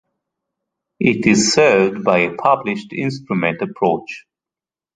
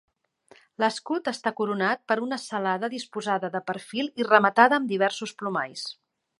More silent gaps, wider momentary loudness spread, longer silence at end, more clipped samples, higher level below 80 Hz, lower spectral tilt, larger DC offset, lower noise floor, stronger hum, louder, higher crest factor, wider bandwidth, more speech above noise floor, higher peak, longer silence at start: neither; about the same, 11 LU vs 12 LU; first, 0.75 s vs 0.45 s; neither; first, -56 dBFS vs -80 dBFS; about the same, -4.5 dB/octave vs -4.5 dB/octave; neither; first, -90 dBFS vs -58 dBFS; neither; first, -16 LUFS vs -25 LUFS; second, 18 dB vs 24 dB; second, 9.4 kHz vs 11.5 kHz; first, 73 dB vs 33 dB; about the same, 0 dBFS vs -2 dBFS; first, 1 s vs 0.8 s